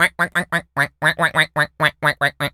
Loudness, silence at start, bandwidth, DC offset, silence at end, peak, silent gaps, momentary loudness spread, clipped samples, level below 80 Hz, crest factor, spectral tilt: -18 LUFS; 0 s; 17 kHz; under 0.1%; 0.05 s; 0 dBFS; none; 4 LU; under 0.1%; -54 dBFS; 18 dB; -3.5 dB/octave